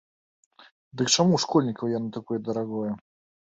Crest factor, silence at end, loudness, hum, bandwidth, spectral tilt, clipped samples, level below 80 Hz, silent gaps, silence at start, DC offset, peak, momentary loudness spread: 20 dB; 0.55 s; -25 LUFS; none; 8.4 kHz; -4.5 dB/octave; under 0.1%; -66 dBFS; 0.71-0.91 s; 0.6 s; under 0.1%; -8 dBFS; 12 LU